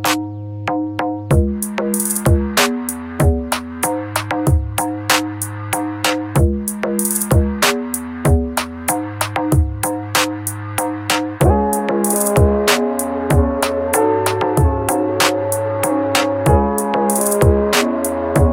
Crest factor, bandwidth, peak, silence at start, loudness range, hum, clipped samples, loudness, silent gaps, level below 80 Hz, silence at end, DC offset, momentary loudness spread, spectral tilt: 16 dB; 17 kHz; 0 dBFS; 0 s; 3 LU; none; under 0.1%; -17 LUFS; none; -26 dBFS; 0 s; under 0.1%; 7 LU; -4.5 dB/octave